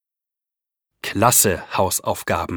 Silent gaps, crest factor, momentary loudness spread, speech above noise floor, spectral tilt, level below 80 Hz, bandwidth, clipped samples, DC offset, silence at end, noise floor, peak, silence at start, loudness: none; 20 dB; 12 LU; 68 dB; -3 dB/octave; -50 dBFS; over 20 kHz; under 0.1%; under 0.1%; 0 s; -87 dBFS; -2 dBFS; 1.05 s; -18 LUFS